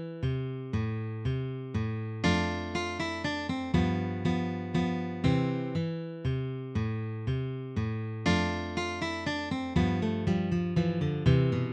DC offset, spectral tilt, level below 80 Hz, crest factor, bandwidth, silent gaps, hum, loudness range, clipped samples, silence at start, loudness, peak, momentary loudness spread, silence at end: under 0.1%; -7 dB/octave; -46 dBFS; 18 dB; 9.4 kHz; none; none; 3 LU; under 0.1%; 0 s; -31 LUFS; -12 dBFS; 6 LU; 0 s